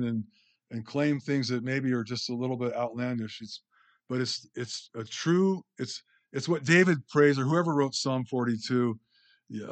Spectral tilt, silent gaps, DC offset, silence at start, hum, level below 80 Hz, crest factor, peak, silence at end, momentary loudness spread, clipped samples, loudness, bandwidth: -5.5 dB/octave; none; under 0.1%; 0 s; none; -78 dBFS; 20 dB; -8 dBFS; 0 s; 18 LU; under 0.1%; -29 LUFS; 9.2 kHz